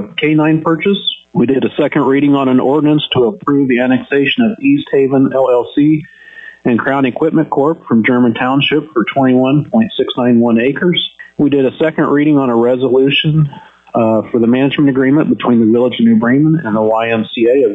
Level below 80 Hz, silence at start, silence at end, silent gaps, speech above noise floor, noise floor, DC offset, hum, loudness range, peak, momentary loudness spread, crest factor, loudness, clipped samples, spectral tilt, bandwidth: -54 dBFS; 0 s; 0 s; none; 24 dB; -35 dBFS; under 0.1%; none; 2 LU; -2 dBFS; 4 LU; 8 dB; -12 LUFS; under 0.1%; -9 dB/octave; 4 kHz